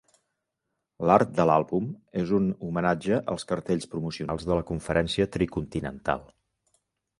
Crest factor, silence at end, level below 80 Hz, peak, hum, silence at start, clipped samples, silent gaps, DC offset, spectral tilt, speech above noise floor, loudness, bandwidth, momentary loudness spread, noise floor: 22 dB; 0.95 s; -50 dBFS; -4 dBFS; none; 1 s; under 0.1%; none; under 0.1%; -6.5 dB/octave; 56 dB; -27 LUFS; 11.5 kHz; 10 LU; -82 dBFS